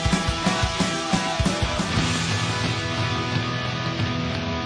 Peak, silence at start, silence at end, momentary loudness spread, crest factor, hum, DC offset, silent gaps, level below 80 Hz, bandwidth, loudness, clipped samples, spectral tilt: -10 dBFS; 0 s; 0 s; 3 LU; 14 dB; none; under 0.1%; none; -36 dBFS; 10.5 kHz; -24 LUFS; under 0.1%; -4.5 dB/octave